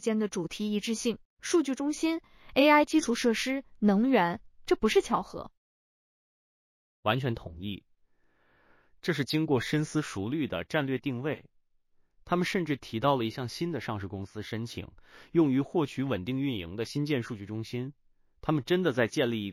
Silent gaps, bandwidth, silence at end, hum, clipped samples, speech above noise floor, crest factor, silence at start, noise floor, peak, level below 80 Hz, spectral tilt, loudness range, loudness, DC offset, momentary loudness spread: 1.25-1.37 s, 5.57-7.03 s; 15 kHz; 0 s; none; under 0.1%; 38 dB; 20 dB; 0 s; -67 dBFS; -10 dBFS; -58 dBFS; -5.5 dB/octave; 7 LU; -30 LUFS; under 0.1%; 12 LU